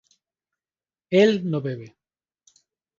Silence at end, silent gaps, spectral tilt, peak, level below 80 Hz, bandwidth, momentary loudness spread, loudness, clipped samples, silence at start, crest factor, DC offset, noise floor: 1.1 s; none; -6.5 dB/octave; -4 dBFS; -70 dBFS; 7.4 kHz; 15 LU; -21 LUFS; under 0.1%; 1.1 s; 22 dB; under 0.1%; under -90 dBFS